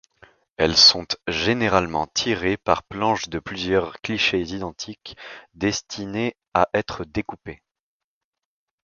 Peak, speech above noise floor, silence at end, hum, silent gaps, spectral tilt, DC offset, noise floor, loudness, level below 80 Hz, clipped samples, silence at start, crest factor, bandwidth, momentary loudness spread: 0 dBFS; 64 dB; 1.3 s; none; 6.48-6.52 s; -3.5 dB/octave; under 0.1%; -87 dBFS; -21 LUFS; -48 dBFS; under 0.1%; 0.6 s; 24 dB; 7.2 kHz; 18 LU